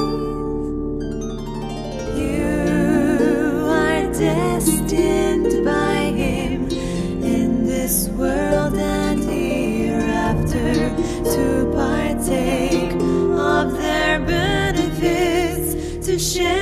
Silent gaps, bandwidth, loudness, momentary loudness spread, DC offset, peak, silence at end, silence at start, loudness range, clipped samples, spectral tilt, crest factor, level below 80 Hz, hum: none; 14 kHz; -19 LUFS; 7 LU; under 0.1%; -4 dBFS; 0 s; 0 s; 2 LU; under 0.1%; -5 dB/octave; 14 dB; -32 dBFS; none